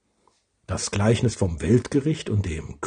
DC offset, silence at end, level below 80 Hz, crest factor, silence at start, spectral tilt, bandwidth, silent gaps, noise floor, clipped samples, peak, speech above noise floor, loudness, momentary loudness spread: under 0.1%; 0 s; -44 dBFS; 18 dB; 0.7 s; -6 dB/octave; 10 kHz; none; -66 dBFS; under 0.1%; -6 dBFS; 43 dB; -24 LUFS; 8 LU